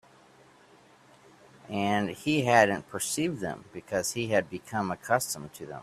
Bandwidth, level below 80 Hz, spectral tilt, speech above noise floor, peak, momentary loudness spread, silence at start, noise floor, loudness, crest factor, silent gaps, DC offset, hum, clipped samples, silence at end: 15.5 kHz; -66 dBFS; -4 dB/octave; 29 dB; -6 dBFS; 14 LU; 1.7 s; -58 dBFS; -28 LUFS; 24 dB; none; under 0.1%; none; under 0.1%; 0 s